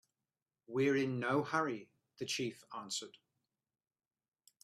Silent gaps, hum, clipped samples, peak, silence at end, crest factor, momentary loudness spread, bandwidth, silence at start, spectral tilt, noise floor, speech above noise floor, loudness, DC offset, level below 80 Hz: none; none; under 0.1%; -20 dBFS; 1.55 s; 20 dB; 14 LU; 14.5 kHz; 0.7 s; -4.5 dB/octave; under -90 dBFS; over 53 dB; -37 LUFS; under 0.1%; -82 dBFS